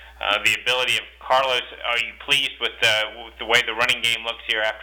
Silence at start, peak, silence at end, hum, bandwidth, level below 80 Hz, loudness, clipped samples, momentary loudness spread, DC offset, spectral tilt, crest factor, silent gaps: 0 s; -6 dBFS; 0 s; none; over 20 kHz; -52 dBFS; -20 LUFS; under 0.1%; 5 LU; under 0.1%; -0.5 dB/octave; 16 dB; none